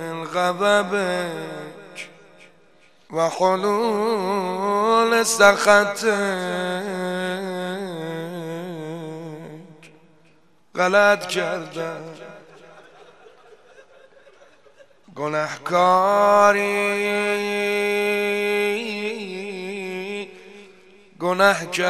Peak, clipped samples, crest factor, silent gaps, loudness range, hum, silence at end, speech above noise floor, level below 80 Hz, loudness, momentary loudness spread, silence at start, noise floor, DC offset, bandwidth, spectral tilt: 0 dBFS; under 0.1%; 22 dB; none; 12 LU; none; 0 s; 39 dB; -68 dBFS; -21 LUFS; 18 LU; 0 s; -59 dBFS; 0.2%; 14.5 kHz; -3.5 dB/octave